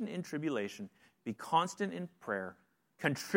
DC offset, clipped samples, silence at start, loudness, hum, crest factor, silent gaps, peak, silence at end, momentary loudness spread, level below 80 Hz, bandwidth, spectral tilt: under 0.1%; under 0.1%; 0 s; -37 LUFS; none; 26 dB; none; -12 dBFS; 0 s; 15 LU; -84 dBFS; 16.5 kHz; -5 dB/octave